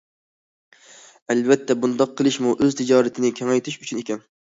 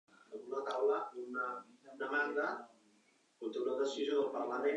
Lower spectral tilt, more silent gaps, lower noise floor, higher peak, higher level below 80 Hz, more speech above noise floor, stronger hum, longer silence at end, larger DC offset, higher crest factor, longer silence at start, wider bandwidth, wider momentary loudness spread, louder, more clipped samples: first, -5 dB/octave vs -3.5 dB/octave; neither; second, -48 dBFS vs -72 dBFS; first, -2 dBFS vs -22 dBFS; first, -64 dBFS vs under -90 dBFS; second, 28 dB vs 34 dB; neither; first, 0.3 s vs 0 s; neither; about the same, 20 dB vs 16 dB; first, 1.3 s vs 0.3 s; second, 8 kHz vs 9 kHz; second, 10 LU vs 13 LU; first, -21 LUFS vs -38 LUFS; neither